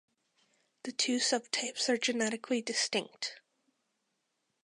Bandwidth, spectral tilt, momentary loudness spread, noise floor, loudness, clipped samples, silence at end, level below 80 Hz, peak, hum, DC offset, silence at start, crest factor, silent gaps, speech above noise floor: 11.5 kHz; -1.5 dB/octave; 10 LU; -81 dBFS; -32 LUFS; under 0.1%; 1.25 s; -88 dBFS; -16 dBFS; none; under 0.1%; 0.85 s; 20 dB; none; 48 dB